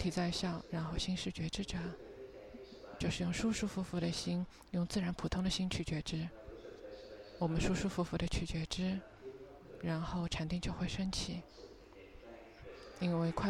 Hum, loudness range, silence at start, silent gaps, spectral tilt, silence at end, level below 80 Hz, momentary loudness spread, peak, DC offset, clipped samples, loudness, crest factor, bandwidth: none; 4 LU; 0 s; none; -5.5 dB/octave; 0 s; -52 dBFS; 17 LU; -20 dBFS; under 0.1%; under 0.1%; -38 LUFS; 18 dB; 12.5 kHz